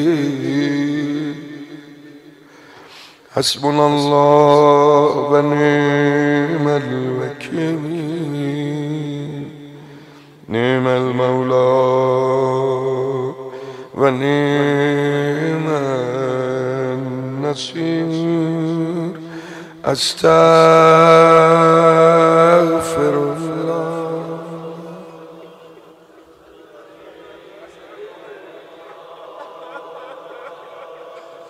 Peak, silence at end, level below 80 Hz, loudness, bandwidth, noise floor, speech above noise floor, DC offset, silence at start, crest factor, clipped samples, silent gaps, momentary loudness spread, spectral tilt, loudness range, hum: 0 dBFS; 0 s; -60 dBFS; -15 LUFS; 13.5 kHz; -45 dBFS; 32 dB; under 0.1%; 0 s; 16 dB; under 0.1%; none; 24 LU; -6 dB/octave; 15 LU; none